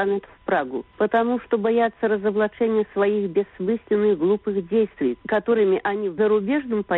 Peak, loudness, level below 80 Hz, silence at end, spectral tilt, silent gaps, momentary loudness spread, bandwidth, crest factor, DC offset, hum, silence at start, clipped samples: -8 dBFS; -22 LUFS; -58 dBFS; 0 s; -5 dB/octave; none; 5 LU; 4.1 kHz; 14 dB; under 0.1%; none; 0 s; under 0.1%